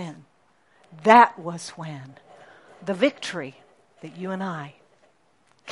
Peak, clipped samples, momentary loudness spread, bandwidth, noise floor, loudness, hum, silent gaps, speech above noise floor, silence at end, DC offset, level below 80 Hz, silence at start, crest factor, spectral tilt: 0 dBFS; under 0.1%; 26 LU; 11.5 kHz; -64 dBFS; -22 LUFS; none; none; 41 dB; 0 s; under 0.1%; -78 dBFS; 0 s; 26 dB; -5 dB/octave